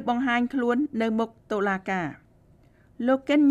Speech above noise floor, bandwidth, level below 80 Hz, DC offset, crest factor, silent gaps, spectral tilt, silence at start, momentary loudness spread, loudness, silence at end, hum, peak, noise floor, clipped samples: 33 dB; 8.4 kHz; -62 dBFS; under 0.1%; 14 dB; none; -6.5 dB/octave; 0 s; 7 LU; -26 LUFS; 0 s; none; -10 dBFS; -57 dBFS; under 0.1%